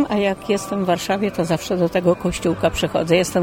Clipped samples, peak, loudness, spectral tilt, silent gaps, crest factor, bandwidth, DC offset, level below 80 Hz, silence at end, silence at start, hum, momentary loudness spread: under 0.1%; -4 dBFS; -20 LUFS; -5.5 dB/octave; none; 16 dB; 16.5 kHz; under 0.1%; -42 dBFS; 0 s; 0 s; none; 4 LU